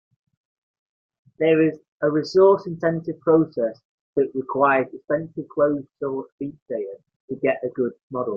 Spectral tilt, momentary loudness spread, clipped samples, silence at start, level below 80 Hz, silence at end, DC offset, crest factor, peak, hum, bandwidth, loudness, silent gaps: -8 dB/octave; 13 LU; under 0.1%; 1.4 s; -66 dBFS; 0 s; under 0.1%; 18 dB; -4 dBFS; none; 7 kHz; -22 LUFS; 1.88-2.00 s, 3.85-4.13 s, 6.32-6.38 s, 6.62-6.66 s, 7.16-7.28 s, 8.03-8.10 s